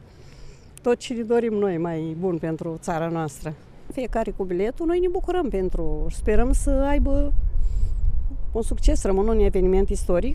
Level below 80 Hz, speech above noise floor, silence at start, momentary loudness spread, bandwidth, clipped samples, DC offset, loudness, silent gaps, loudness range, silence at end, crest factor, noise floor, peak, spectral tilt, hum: -24 dBFS; 21 dB; 0.2 s; 8 LU; 11.5 kHz; under 0.1%; under 0.1%; -25 LUFS; none; 3 LU; 0 s; 18 dB; -42 dBFS; -2 dBFS; -7 dB/octave; none